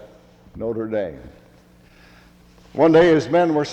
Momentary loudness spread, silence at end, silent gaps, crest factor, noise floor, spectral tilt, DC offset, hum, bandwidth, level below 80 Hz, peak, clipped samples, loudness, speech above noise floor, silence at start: 17 LU; 0 s; none; 18 dB; -51 dBFS; -6.5 dB/octave; under 0.1%; none; 8.4 kHz; -50 dBFS; -4 dBFS; under 0.1%; -18 LUFS; 33 dB; 0.55 s